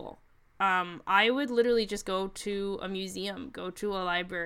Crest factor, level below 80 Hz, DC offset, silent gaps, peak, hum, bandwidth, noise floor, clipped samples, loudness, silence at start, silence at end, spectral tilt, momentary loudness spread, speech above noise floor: 20 dB; -56 dBFS; under 0.1%; none; -10 dBFS; none; 15.5 kHz; -56 dBFS; under 0.1%; -30 LUFS; 0 s; 0 s; -4 dB/octave; 12 LU; 26 dB